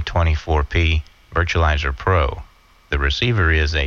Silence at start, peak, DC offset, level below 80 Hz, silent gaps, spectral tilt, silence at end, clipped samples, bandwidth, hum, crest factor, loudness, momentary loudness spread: 0 s; -4 dBFS; under 0.1%; -24 dBFS; none; -6 dB/octave; 0 s; under 0.1%; 7 kHz; none; 16 dB; -19 LUFS; 7 LU